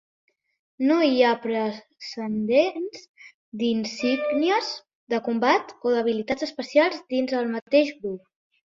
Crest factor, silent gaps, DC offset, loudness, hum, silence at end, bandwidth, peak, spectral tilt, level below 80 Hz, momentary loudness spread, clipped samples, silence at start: 18 dB; 3.09-3.14 s, 3.34-3.52 s, 4.95-5.07 s, 7.62-7.66 s; under 0.1%; -24 LUFS; none; 0.5 s; 7.6 kHz; -6 dBFS; -5 dB/octave; -68 dBFS; 13 LU; under 0.1%; 0.8 s